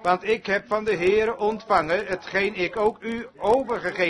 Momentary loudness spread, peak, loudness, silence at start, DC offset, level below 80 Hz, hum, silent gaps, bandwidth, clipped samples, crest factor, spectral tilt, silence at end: 6 LU; -6 dBFS; -24 LUFS; 0 s; under 0.1%; -54 dBFS; none; none; 10.5 kHz; under 0.1%; 18 dB; -5.5 dB/octave; 0 s